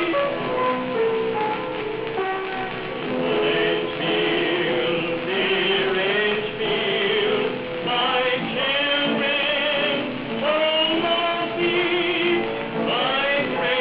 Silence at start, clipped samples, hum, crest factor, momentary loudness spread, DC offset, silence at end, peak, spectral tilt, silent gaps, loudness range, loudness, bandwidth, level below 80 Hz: 0 s; under 0.1%; none; 14 dB; 6 LU; under 0.1%; 0 s; -8 dBFS; -1.5 dB/octave; none; 3 LU; -22 LUFS; 5.4 kHz; -54 dBFS